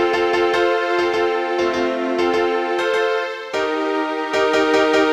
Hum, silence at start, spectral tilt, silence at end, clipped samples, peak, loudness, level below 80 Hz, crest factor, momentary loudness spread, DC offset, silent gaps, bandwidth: none; 0 s; -3.5 dB/octave; 0 s; under 0.1%; -4 dBFS; -19 LUFS; -54 dBFS; 14 dB; 5 LU; under 0.1%; none; 12 kHz